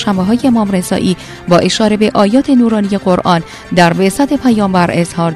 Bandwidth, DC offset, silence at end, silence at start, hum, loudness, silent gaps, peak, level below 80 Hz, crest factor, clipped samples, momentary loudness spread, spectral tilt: 13.5 kHz; under 0.1%; 0 s; 0 s; none; -11 LUFS; none; 0 dBFS; -40 dBFS; 12 dB; 0.3%; 5 LU; -6 dB/octave